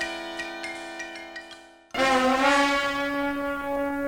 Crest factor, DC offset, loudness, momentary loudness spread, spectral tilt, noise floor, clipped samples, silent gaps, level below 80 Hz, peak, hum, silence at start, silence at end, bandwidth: 18 dB; under 0.1%; -25 LUFS; 17 LU; -2.5 dB/octave; -48 dBFS; under 0.1%; none; -54 dBFS; -8 dBFS; none; 0 s; 0 s; 16.5 kHz